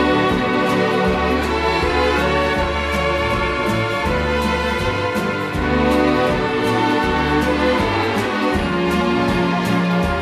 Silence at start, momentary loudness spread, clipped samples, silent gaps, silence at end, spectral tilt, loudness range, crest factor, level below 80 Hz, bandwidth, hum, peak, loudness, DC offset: 0 s; 3 LU; under 0.1%; none; 0 s; -6 dB/octave; 1 LU; 14 dB; -30 dBFS; 14 kHz; none; -4 dBFS; -18 LUFS; under 0.1%